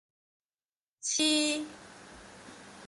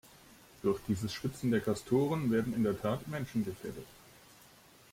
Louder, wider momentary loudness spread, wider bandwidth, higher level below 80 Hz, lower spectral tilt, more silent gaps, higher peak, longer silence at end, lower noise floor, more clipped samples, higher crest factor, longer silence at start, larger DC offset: first, -29 LUFS vs -34 LUFS; first, 24 LU vs 11 LU; second, 11.5 kHz vs 16.5 kHz; second, -70 dBFS vs -62 dBFS; second, -0.5 dB/octave vs -6.5 dB/octave; neither; about the same, -16 dBFS vs -18 dBFS; second, 0 s vs 1 s; first, under -90 dBFS vs -60 dBFS; neither; about the same, 20 dB vs 18 dB; first, 1.05 s vs 0.65 s; neither